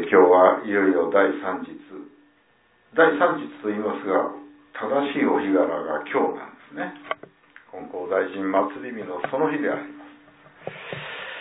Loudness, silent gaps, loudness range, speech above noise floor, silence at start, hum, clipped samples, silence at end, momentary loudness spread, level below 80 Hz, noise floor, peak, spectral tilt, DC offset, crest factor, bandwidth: -23 LUFS; none; 6 LU; 39 dB; 0 s; none; under 0.1%; 0 s; 21 LU; -72 dBFS; -61 dBFS; -2 dBFS; -9.5 dB/octave; under 0.1%; 20 dB; 4 kHz